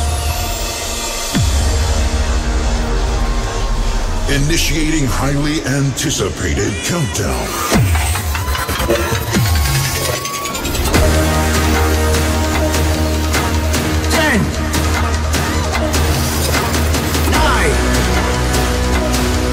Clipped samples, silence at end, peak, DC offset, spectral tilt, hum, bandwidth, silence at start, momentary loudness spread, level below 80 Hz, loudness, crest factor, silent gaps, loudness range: under 0.1%; 0 s; -2 dBFS; under 0.1%; -4 dB/octave; none; 16 kHz; 0 s; 5 LU; -20 dBFS; -16 LUFS; 14 dB; none; 3 LU